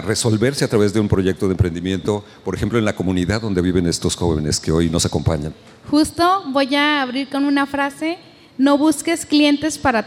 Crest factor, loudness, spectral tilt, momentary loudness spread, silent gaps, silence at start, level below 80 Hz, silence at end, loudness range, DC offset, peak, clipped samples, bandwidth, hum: 16 dB; -18 LUFS; -5 dB/octave; 7 LU; none; 0 s; -38 dBFS; 0 s; 2 LU; under 0.1%; -2 dBFS; under 0.1%; 15.5 kHz; none